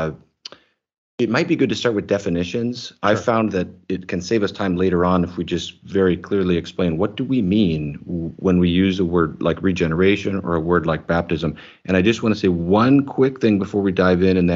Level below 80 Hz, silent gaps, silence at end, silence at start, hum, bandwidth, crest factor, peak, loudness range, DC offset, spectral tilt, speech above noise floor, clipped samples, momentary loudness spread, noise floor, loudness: -46 dBFS; 0.98-1.18 s; 0 s; 0 s; none; 7.6 kHz; 16 dB; -2 dBFS; 3 LU; under 0.1%; -7 dB/octave; 24 dB; under 0.1%; 10 LU; -43 dBFS; -19 LUFS